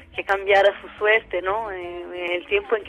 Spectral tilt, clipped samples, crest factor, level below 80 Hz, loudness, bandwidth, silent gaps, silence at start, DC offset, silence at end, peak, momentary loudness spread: -4 dB/octave; under 0.1%; 16 dB; -52 dBFS; -21 LUFS; 10 kHz; none; 0 s; under 0.1%; 0 s; -6 dBFS; 13 LU